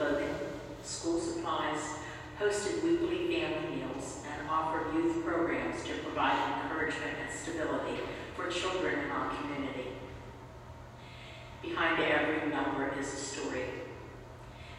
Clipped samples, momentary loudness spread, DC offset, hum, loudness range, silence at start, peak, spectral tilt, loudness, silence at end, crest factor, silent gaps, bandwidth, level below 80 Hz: under 0.1%; 17 LU; under 0.1%; none; 4 LU; 0 s; -16 dBFS; -4 dB/octave; -34 LUFS; 0 s; 18 dB; none; 14 kHz; -58 dBFS